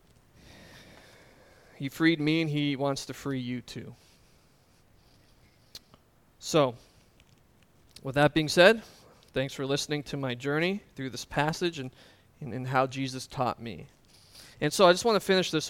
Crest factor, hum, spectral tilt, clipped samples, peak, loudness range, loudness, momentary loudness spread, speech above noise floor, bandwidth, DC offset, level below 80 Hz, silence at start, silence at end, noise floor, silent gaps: 26 dB; none; -4.5 dB/octave; under 0.1%; -4 dBFS; 8 LU; -28 LUFS; 21 LU; 35 dB; 17 kHz; under 0.1%; -60 dBFS; 0.75 s; 0 s; -63 dBFS; none